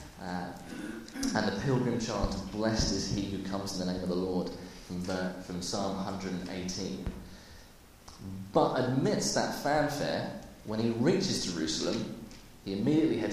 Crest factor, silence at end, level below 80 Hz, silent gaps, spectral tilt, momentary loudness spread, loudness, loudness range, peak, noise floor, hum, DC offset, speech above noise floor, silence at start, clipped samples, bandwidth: 20 dB; 0 s; -50 dBFS; none; -5 dB/octave; 14 LU; -32 LUFS; 6 LU; -12 dBFS; -54 dBFS; none; under 0.1%; 23 dB; 0 s; under 0.1%; 15.5 kHz